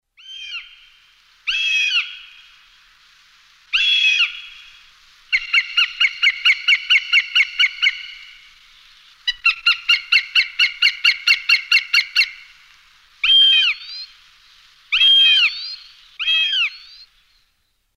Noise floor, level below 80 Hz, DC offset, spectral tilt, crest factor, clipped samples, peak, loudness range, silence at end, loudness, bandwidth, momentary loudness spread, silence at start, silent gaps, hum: -67 dBFS; -58 dBFS; under 0.1%; 5.5 dB/octave; 16 dB; under 0.1%; -2 dBFS; 6 LU; 1.2 s; -14 LUFS; 16 kHz; 19 LU; 0.3 s; none; none